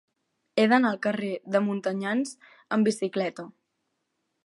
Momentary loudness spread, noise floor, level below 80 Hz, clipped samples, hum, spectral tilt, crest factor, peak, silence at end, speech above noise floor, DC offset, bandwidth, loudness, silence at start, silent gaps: 11 LU; -78 dBFS; -82 dBFS; under 0.1%; none; -5.5 dB/octave; 22 dB; -6 dBFS; 0.95 s; 53 dB; under 0.1%; 11.5 kHz; -26 LUFS; 0.55 s; none